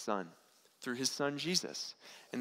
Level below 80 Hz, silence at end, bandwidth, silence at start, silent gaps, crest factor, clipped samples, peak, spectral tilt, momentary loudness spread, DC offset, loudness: -82 dBFS; 0 s; 16 kHz; 0 s; none; 22 dB; under 0.1%; -16 dBFS; -2.5 dB/octave; 13 LU; under 0.1%; -37 LUFS